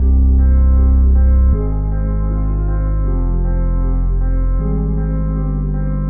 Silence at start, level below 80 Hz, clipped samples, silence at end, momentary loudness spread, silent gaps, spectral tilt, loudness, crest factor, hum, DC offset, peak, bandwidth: 0 s; -14 dBFS; under 0.1%; 0 s; 7 LU; none; -13.5 dB/octave; -17 LUFS; 8 dB; none; under 0.1%; -6 dBFS; 2.2 kHz